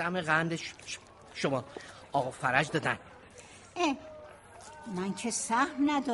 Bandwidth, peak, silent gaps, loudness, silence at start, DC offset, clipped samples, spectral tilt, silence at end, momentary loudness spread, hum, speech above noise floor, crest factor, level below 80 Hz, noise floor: 11.5 kHz; -10 dBFS; none; -32 LUFS; 0 s; under 0.1%; under 0.1%; -4 dB/octave; 0 s; 22 LU; none; 21 dB; 24 dB; -66 dBFS; -52 dBFS